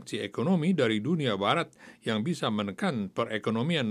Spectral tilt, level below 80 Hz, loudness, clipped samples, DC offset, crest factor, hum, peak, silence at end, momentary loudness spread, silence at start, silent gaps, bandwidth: -6 dB/octave; -76 dBFS; -29 LUFS; under 0.1%; under 0.1%; 18 dB; none; -10 dBFS; 0 s; 6 LU; 0 s; none; 12 kHz